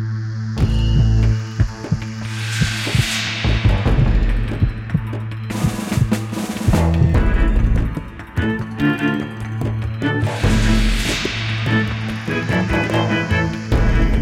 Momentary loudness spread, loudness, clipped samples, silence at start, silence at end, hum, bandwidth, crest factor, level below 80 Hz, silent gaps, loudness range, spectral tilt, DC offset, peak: 8 LU; -19 LUFS; under 0.1%; 0 s; 0 s; none; 15.5 kHz; 12 dB; -22 dBFS; none; 1 LU; -6 dB/octave; under 0.1%; -4 dBFS